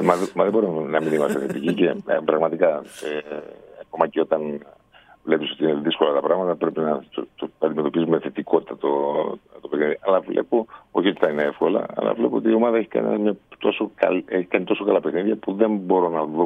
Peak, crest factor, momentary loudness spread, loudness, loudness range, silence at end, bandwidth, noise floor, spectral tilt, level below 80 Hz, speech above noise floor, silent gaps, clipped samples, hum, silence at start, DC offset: -2 dBFS; 20 dB; 9 LU; -22 LUFS; 3 LU; 0 s; 13.5 kHz; -52 dBFS; -6.5 dB/octave; -66 dBFS; 30 dB; none; under 0.1%; none; 0 s; under 0.1%